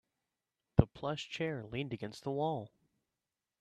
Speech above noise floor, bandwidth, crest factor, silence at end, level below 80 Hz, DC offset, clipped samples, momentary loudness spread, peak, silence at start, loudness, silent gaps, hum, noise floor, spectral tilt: over 51 dB; 12 kHz; 30 dB; 0.95 s; -52 dBFS; under 0.1%; under 0.1%; 10 LU; -8 dBFS; 0.75 s; -37 LUFS; none; none; under -90 dBFS; -7 dB/octave